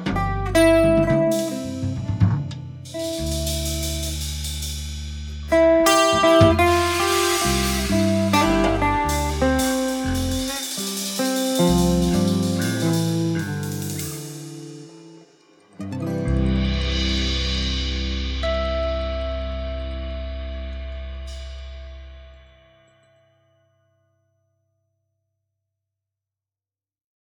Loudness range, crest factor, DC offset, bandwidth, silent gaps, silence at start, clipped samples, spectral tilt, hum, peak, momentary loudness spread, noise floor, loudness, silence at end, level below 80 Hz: 14 LU; 20 dB; under 0.1%; 19 kHz; none; 0 s; under 0.1%; -5 dB/octave; none; -2 dBFS; 18 LU; under -90 dBFS; -21 LUFS; 4.9 s; -32 dBFS